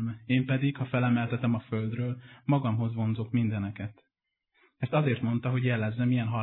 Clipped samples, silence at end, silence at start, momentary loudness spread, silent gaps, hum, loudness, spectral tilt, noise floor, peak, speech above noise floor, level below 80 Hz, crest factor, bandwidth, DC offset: under 0.1%; 0 s; 0 s; 8 LU; none; none; -29 LUFS; -11.5 dB/octave; -79 dBFS; -14 dBFS; 51 dB; -66 dBFS; 14 dB; 4.1 kHz; under 0.1%